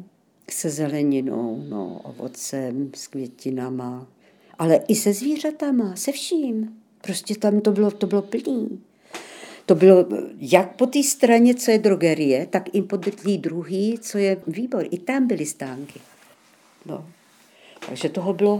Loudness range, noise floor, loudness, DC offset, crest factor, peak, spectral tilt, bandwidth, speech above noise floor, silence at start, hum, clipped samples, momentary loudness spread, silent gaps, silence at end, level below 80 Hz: 11 LU; -55 dBFS; -21 LUFS; under 0.1%; 22 dB; 0 dBFS; -5 dB/octave; 19 kHz; 34 dB; 0 s; none; under 0.1%; 19 LU; none; 0 s; -76 dBFS